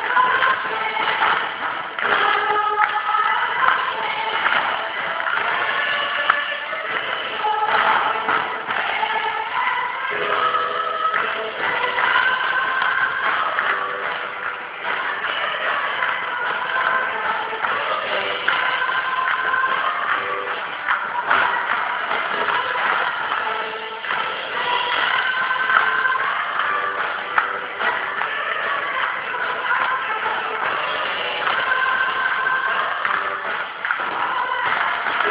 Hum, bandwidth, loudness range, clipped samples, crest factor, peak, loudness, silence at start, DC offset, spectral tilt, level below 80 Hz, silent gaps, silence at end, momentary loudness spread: none; 4 kHz; 2 LU; under 0.1%; 22 dB; 0 dBFS; -20 LUFS; 0 s; under 0.1%; -5 dB/octave; -64 dBFS; none; 0 s; 6 LU